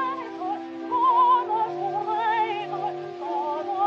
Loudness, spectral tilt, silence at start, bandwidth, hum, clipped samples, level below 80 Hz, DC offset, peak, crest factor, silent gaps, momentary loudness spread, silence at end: -25 LUFS; -6 dB/octave; 0 s; 7.2 kHz; none; under 0.1%; -86 dBFS; under 0.1%; -12 dBFS; 14 dB; none; 12 LU; 0 s